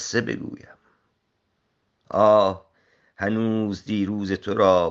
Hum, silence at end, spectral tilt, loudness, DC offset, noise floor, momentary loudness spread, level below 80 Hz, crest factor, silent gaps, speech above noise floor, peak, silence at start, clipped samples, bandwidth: none; 0 s; -5.5 dB/octave; -22 LUFS; under 0.1%; -73 dBFS; 15 LU; -64 dBFS; 20 dB; none; 51 dB; -4 dBFS; 0 s; under 0.1%; 7.8 kHz